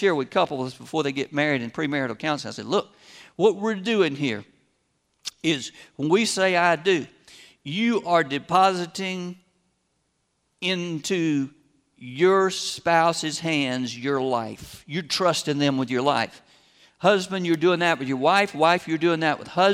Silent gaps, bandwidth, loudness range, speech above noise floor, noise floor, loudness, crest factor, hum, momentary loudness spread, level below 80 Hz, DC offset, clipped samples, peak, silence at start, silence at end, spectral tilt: none; 15 kHz; 4 LU; 49 dB; -72 dBFS; -23 LUFS; 20 dB; none; 12 LU; -66 dBFS; under 0.1%; under 0.1%; -4 dBFS; 0 s; 0 s; -4.5 dB/octave